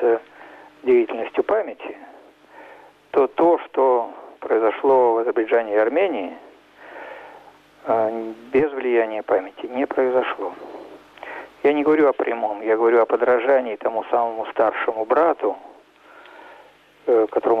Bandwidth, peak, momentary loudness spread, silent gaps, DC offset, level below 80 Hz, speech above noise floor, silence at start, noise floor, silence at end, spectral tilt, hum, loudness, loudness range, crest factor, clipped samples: 5.2 kHz; -8 dBFS; 19 LU; none; under 0.1%; -66 dBFS; 30 dB; 0 s; -50 dBFS; 0 s; -7 dB/octave; none; -20 LUFS; 5 LU; 14 dB; under 0.1%